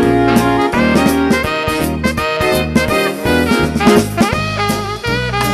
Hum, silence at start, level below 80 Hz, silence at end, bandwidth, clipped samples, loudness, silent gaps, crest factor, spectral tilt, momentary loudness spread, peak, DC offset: none; 0 s; -30 dBFS; 0 s; 15.5 kHz; under 0.1%; -14 LUFS; none; 14 dB; -5 dB/octave; 5 LU; 0 dBFS; under 0.1%